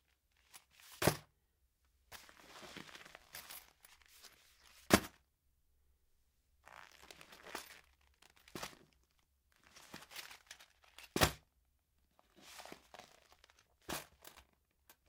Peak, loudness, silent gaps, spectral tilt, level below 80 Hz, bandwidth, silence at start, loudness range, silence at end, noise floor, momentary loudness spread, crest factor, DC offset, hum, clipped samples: -10 dBFS; -40 LUFS; none; -3.5 dB/octave; -64 dBFS; 16.5 kHz; 0.55 s; 14 LU; 0.7 s; -79 dBFS; 26 LU; 36 dB; under 0.1%; none; under 0.1%